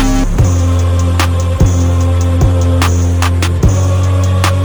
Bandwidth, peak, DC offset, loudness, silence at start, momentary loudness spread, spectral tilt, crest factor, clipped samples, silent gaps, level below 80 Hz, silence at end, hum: over 20 kHz; 0 dBFS; under 0.1%; -12 LUFS; 0 s; 1 LU; -6 dB/octave; 10 dB; under 0.1%; none; -20 dBFS; 0 s; none